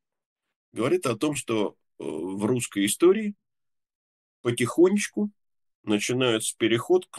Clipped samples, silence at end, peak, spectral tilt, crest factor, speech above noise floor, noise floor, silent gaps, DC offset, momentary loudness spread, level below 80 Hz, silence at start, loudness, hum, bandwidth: under 0.1%; 0 s; -8 dBFS; -4.5 dB/octave; 18 dB; 61 dB; -85 dBFS; 3.95-4.44 s, 5.75-5.84 s; under 0.1%; 12 LU; -72 dBFS; 0.75 s; -25 LUFS; none; 12.5 kHz